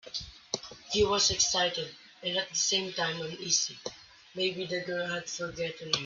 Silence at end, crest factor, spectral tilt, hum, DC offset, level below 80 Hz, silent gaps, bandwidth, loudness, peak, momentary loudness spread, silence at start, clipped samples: 0 s; 22 dB; -1.5 dB/octave; none; under 0.1%; -58 dBFS; none; 7.8 kHz; -30 LUFS; -10 dBFS; 14 LU; 0.05 s; under 0.1%